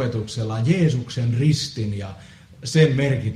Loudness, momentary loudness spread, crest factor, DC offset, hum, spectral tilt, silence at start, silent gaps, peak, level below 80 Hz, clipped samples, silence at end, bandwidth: -21 LUFS; 11 LU; 16 dB; under 0.1%; none; -6.5 dB/octave; 0 s; none; -4 dBFS; -50 dBFS; under 0.1%; 0 s; 11.5 kHz